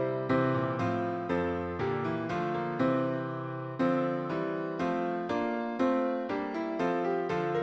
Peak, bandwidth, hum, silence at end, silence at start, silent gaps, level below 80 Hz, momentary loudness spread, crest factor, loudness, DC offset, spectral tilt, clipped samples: -16 dBFS; 7.8 kHz; none; 0 s; 0 s; none; -62 dBFS; 5 LU; 14 dB; -31 LUFS; under 0.1%; -8 dB/octave; under 0.1%